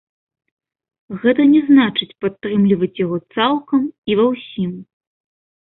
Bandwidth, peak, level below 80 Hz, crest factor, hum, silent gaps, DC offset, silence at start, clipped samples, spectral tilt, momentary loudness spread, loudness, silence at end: 4.1 kHz; -2 dBFS; -60 dBFS; 16 dB; none; 3.98-4.03 s; under 0.1%; 1.1 s; under 0.1%; -11.5 dB/octave; 12 LU; -17 LUFS; 0.85 s